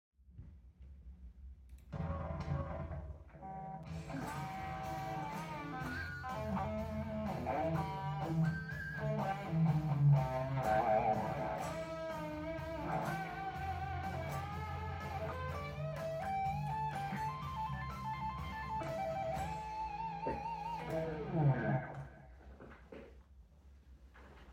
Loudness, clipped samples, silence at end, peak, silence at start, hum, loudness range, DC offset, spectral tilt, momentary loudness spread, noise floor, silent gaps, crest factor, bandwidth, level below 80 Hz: -39 LUFS; under 0.1%; 0 s; -20 dBFS; 0.25 s; none; 9 LU; under 0.1%; -7.5 dB/octave; 22 LU; -60 dBFS; none; 18 dB; 16 kHz; -56 dBFS